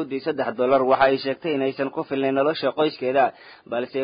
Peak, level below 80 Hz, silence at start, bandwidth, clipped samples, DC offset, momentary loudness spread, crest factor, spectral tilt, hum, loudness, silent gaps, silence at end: -6 dBFS; -64 dBFS; 0 s; 5.2 kHz; under 0.1%; under 0.1%; 9 LU; 18 dB; -10 dB/octave; none; -22 LUFS; none; 0 s